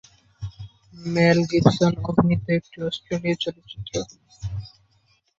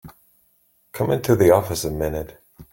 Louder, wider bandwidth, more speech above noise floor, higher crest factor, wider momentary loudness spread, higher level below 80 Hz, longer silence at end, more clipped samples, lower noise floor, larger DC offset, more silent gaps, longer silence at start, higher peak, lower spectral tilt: about the same, -22 LUFS vs -20 LUFS; second, 7.8 kHz vs 17 kHz; about the same, 42 dB vs 43 dB; about the same, 22 dB vs 20 dB; about the same, 20 LU vs 18 LU; about the same, -46 dBFS vs -44 dBFS; first, 0.7 s vs 0.1 s; neither; about the same, -64 dBFS vs -62 dBFS; neither; neither; first, 0.4 s vs 0.05 s; about the same, -2 dBFS vs -2 dBFS; about the same, -6.5 dB/octave vs -6 dB/octave